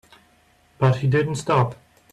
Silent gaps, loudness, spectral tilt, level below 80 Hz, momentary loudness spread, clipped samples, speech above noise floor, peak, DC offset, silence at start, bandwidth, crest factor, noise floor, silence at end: none; -21 LUFS; -7 dB/octave; -56 dBFS; 3 LU; under 0.1%; 39 dB; -6 dBFS; under 0.1%; 0.8 s; 11 kHz; 16 dB; -58 dBFS; 0.4 s